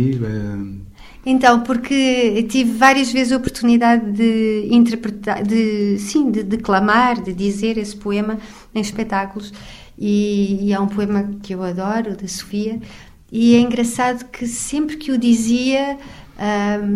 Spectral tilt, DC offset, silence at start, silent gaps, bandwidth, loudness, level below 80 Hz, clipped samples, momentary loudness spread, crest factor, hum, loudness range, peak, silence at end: -5 dB/octave; under 0.1%; 0 s; none; 13.5 kHz; -18 LUFS; -44 dBFS; under 0.1%; 13 LU; 18 dB; none; 6 LU; 0 dBFS; 0 s